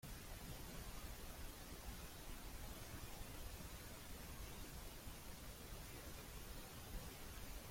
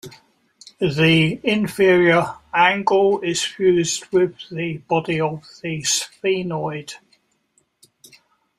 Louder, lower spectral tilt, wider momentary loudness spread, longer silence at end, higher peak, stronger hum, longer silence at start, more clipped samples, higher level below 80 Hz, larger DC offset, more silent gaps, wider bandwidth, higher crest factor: second, -54 LUFS vs -19 LUFS; about the same, -3.5 dB/octave vs -4.5 dB/octave; second, 1 LU vs 12 LU; second, 0 s vs 1.6 s; second, -38 dBFS vs -2 dBFS; neither; about the same, 0.05 s vs 0.05 s; neither; about the same, -56 dBFS vs -56 dBFS; neither; neither; about the same, 16.5 kHz vs 15 kHz; about the same, 16 dB vs 18 dB